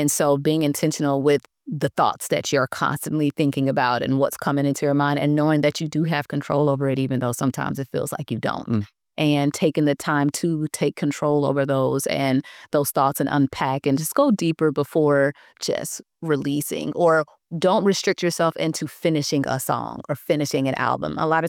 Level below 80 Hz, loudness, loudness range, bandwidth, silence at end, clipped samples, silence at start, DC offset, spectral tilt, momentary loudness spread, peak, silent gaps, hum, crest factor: -62 dBFS; -22 LUFS; 2 LU; 19 kHz; 0 s; under 0.1%; 0 s; under 0.1%; -5.5 dB/octave; 7 LU; -8 dBFS; none; none; 14 dB